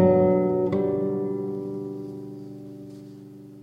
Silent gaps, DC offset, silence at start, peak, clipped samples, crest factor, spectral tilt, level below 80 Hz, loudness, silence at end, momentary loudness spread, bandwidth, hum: none; under 0.1%; 0 s; -8 dBFS; under 0.1%; 18 dB; -10.5 dB/octave; -62 dBFS; -25 LUFS; 0 s; 22 LU; 5.2 kHz; none